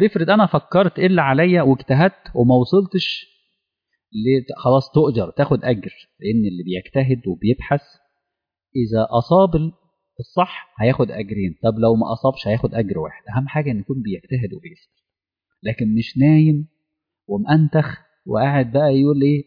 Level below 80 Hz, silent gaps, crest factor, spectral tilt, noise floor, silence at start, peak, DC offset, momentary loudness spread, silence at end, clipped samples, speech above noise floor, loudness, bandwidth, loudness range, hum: -48 dBFS; none; 14 dB; -9.5 dB/octave; -86 dBFS; 0 s; -4 dBFS; under 0.1%; 11 LU; 0.05 s; under 0.1%; 69 dB; -18 LUFS; 5.2 kHz; 5 LU; none